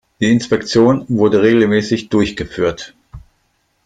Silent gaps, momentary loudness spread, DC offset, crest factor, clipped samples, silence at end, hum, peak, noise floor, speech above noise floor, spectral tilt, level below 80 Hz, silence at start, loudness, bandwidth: none; 8 LU; under 0.1%; 14 dB; under 0.1%; 0.65 s; none; -2 dBFS; -63 dBFS; 49 dB; -6 dB/octave; -44 dBFS; 0.2 s; -14 LUFS; 9.2 kHz